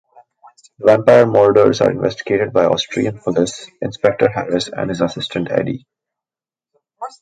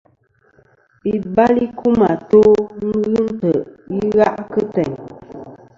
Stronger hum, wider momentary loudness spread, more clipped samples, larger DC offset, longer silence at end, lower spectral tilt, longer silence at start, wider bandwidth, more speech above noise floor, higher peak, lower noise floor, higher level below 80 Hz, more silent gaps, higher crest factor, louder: neither; about the same, 14 LU vs 16 LU; neither; neither; about the same, 0.15 s vs 0.25 s; second, -5.5 dB/octave vs -8.5 dB/octave; second, 0.8 s vs 1.05 s; first, 9.2 kHz vs 7.2 kHz; first, over 75 dB vs 42 dB; about the same, 0 dBFS vs 0 dBFS; first, under -90 dBFS vs -57 dBFS; about the same, -52 dBFS vs -48 dBFS; neither; about the same, 16 dB vs 16 dB; about the same, -16 LUFS vs -16 LUFS